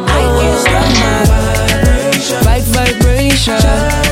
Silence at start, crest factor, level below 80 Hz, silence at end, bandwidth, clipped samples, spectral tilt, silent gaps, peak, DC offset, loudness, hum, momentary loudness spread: 0 s; 10 dB; -14 dBFS; 0 s; 16.5 kHz; under 0.1%; -4.5 dB/octave; none; 0 dBFS; under 0.1%; -11 LUFS; none; 2 LU